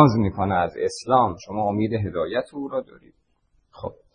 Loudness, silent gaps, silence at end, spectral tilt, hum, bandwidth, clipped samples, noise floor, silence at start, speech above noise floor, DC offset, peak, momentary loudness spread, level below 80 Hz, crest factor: -24 LUFS; none; 0.25 s; -7 dB/octave; none; 10 kHz; under 0.1%; -66 dBFS; 0 s; 43 dB; under 0.1%; 0 dBFS; 11 LU; -52 dBFS; 22 dB